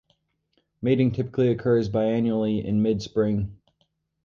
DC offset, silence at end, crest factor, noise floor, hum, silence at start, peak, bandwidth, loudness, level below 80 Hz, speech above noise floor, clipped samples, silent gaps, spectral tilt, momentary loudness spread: under 0.1%; 0.7 s; 16 dB; -72 dBFS; none; 0.8 s; -10 dBFS; 7.2 kHz; -24 LUFS; -50 dBFS; 49 dB; under 0.1%; none; -8.5 dB/octave; 4 LU